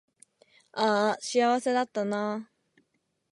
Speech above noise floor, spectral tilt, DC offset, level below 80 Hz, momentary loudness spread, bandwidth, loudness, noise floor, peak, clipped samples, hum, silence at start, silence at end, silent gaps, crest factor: 49 dB; -4 dB/octave; under 0.1%; -84 dBFS; 9 LU; 11.5 kHz; -27 LUFS; -76 dBFS; -12 dBFS; under 0.1%; none; 0.75 s; 0.9 s; none; 18 dB